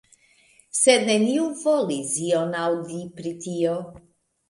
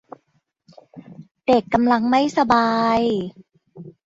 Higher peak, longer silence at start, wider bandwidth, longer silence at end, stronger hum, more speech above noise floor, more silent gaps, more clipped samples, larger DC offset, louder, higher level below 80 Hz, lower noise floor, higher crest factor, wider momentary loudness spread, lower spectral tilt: about the same, -4 dBFS vs -4 dBFS; second, 0.75 s vs 0.95 s; first, 11.5 kHz vs 7.8 kHz; first, 0.5 s vs 0.15 s; neither; second, 35 dB vs 50 dB; second, none vs 1.31-1.35 s; neither; neither; second, -23 LUFS vs -19 LUFS; second, -66 dBFS vs -54 dBFS; second, -58 dBFS vs -68 dBFS; about the same, 20 dB vs 18 dB; first, 15 LU vs 9 LU; second, -3.5 dB/octave vs -5.5 dB/octave